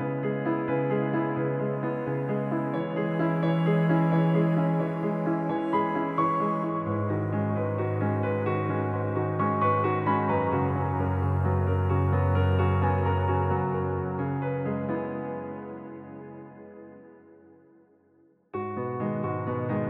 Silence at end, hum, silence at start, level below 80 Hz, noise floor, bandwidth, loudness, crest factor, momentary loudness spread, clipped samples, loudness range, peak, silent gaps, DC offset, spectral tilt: 0 s; none; 0 s; -54 dBFS; -62 dBFS; 4.2 kHz; -27 LUFS; 14 dB; 10 LU; under 0.1%; 11 LU; -12 dBFS; none; under 0.1%; -10.5 dB/octave